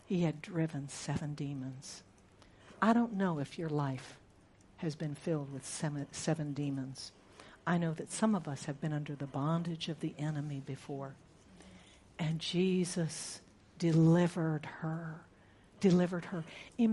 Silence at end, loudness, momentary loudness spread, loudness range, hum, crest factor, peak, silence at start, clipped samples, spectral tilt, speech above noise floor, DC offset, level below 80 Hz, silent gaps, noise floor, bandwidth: 0 s; -35 LUFS; 15 LU; 6 LU; none; 20 dB; -16 dBFS; 0.1 s; under 0.1%; -6 dB/octave; 28 dB; under 0.1%; -68 dBFS; none; -62 dBFS; 11.5 kHz